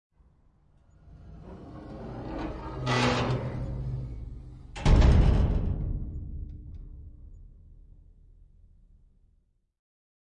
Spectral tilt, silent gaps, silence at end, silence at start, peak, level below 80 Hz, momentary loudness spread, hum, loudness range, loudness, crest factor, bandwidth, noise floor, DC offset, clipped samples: -6.5 dB/octave; none; 2.5 s; 1.05 s; -10 dBFS; -32 dBFS; 24 LU; none; 15 LU; -28 LUFS; 18 dB; 9.8 kHz; -68 dBFS; under 0.1%; under 0.1%